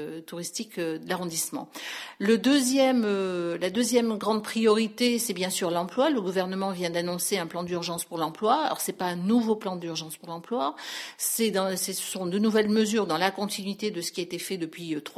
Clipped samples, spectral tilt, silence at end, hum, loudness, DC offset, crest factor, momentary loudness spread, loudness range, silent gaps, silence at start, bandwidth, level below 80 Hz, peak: under 0.1%; -4 dB/octave; 0.05 s; none; -27 LUFS; under 0.1%; 18 dB; 10 LU; 4 LU; none; 0 s; 16 kHz; -72 dBFS; -10 dBFS